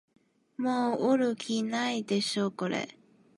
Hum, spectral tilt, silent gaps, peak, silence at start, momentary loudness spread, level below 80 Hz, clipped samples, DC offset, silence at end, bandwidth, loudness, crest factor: none; -4.5 dB/octave; none; -14 dBFS; 0.6 s; 8 LU; -80 dBFS; under 0.1%; under 0.1%; 0.45 s; 11.5 kHz; -30 LUFS; 16 dB